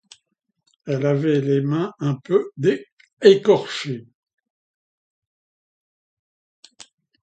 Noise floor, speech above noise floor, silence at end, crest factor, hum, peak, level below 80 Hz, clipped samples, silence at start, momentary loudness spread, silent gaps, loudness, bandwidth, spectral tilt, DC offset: -74 dBFS; 55 dB; 3.2 s; 22 dB; none; 0 dBFS; -70 dBFS; under 0.1%; 0.85 s; 14 LU; 2.92-2.97 s, 3.13-3.17 s; -20 LUFS; 8.8 kHz; -7 dB/octave; under 0.1%